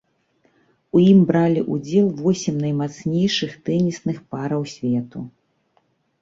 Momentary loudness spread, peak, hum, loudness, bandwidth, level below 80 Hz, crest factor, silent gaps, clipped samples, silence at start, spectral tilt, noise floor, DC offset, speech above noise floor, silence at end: 13 LU; -4 dBFS; none; -20 LUFS; 7.6 kHz; -58 dBFS; 18 dB; none; under 0.1%; 0.95 s; -7 dB/octave; -65 dBFS; under 0.1%; 46 dB; 0.9 s